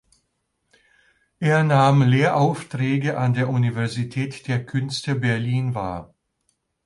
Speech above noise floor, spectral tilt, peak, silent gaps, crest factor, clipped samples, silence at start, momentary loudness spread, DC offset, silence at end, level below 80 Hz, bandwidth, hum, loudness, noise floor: 53 dB; -7 dB/octave; -4 dBFS; none; 18 dB; under 0.1%; 1.4 s; 11 LU; under 0.1%; 0.8 s; -56 dBFS; 11.5 kHz; none; -21 LUFS; -73 dBFS